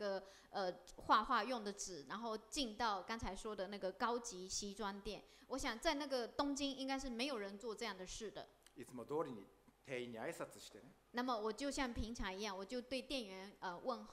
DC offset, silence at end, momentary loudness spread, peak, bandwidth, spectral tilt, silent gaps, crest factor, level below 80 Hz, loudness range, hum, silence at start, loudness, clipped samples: under 0.1%; 0 s; 12 LU; -22 dBFS; 15.5 kHz; -3 dB/octave; none; 22 dB; -62 dBFS; 6 LU; none; 0 s; -44 LUFS; under 0.1%